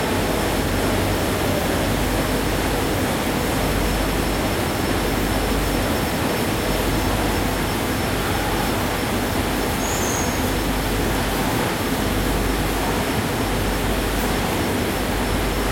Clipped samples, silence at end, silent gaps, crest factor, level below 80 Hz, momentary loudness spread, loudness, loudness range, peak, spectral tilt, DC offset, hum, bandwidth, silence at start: under 0.1%; 0 s; none; 14 dB; -30 dBFS; 1 LU; -21 LUFS; 1 LU; -8 dBFS; -4.5 dB/octave; under 0.1%; none; 16.5 kHz; 0 s